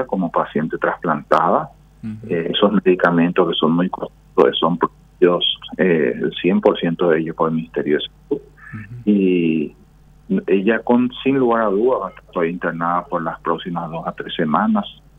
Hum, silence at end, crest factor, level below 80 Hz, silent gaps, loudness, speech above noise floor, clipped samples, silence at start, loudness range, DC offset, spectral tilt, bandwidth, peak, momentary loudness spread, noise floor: none; 0.25 s; 18 dB; -50 dBFS; none; -18 LUFS; 27 dB; under 0.1%; 0 s; 3 LU; under 0.1%; -8 dB/octave; 6 kHz; 0 dBFS; 11 LU; -45 dBFS